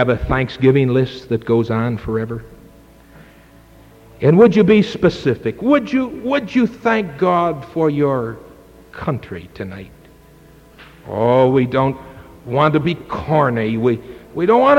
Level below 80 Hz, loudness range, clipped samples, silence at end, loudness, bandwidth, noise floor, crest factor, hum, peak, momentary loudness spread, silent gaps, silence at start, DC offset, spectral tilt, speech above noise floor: -40 dBFS; 8 LU; under 0.1%; 0 s; -17 LUFS; 15.5 kHz; -45 dBFS; 16 dB; none; -2 dBFS; 15 LU; none; 0 s; under 0.1%; -8 dB/octave; 29 dB